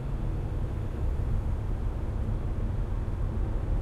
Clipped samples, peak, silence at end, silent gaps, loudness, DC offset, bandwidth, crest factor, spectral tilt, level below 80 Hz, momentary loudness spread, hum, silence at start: under 0.1%; -16 dBFS; 0 s; none; -33 LUFS; under 0.1%; 4.9 kHz; 12 dB; -9 dB/octave; -30 dBFS; 2 LU; none; 0 s